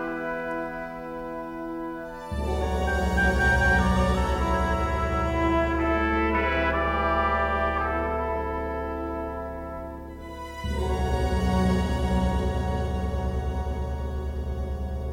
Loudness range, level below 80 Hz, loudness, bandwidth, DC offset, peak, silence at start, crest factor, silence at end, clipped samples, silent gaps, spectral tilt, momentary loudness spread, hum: 6 LU; -30 dBFS; -26 LUFS; 15 kHz; under 0.1%; -10 dBFS; 0 s; 16 dB; 0 s; under 0.1%; none; -6.5 dB/octave; 12 LU; none